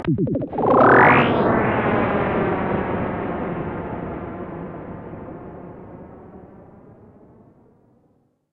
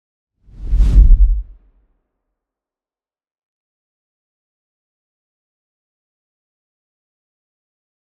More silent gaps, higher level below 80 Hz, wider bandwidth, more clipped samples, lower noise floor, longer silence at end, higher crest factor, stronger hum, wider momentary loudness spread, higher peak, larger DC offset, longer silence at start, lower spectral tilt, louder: neither; second, -44 dBFS vs -18 dBFS; first, 5.4 kHz vs 1.4 kHz; neither; second, -62 dBFS vs under -90 dBFS; second, 1.9 s vs 6.6 s; about the same, 20 dB vs 18 dB; neither; first, 25 LU vs 13 LU; about the same, -2 dBFS vs 0 dBFS; neither; second, 0 s vs 0.6 s; about the same, -9.5 dB/octave vs -8.5 dB/octave; second, -19 LUFS vs -16 LUFS